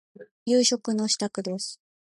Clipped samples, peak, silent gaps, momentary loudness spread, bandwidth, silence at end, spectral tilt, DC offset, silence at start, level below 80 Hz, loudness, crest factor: under 0.1%; -8 dBFS; 0.31-0.46 s; 13 LU; 11.5 kHz; 0.45 s; -3 dB/octave; under 0.1%; 0.2 s; -76 dBFS; -25 LUFS; 20 dB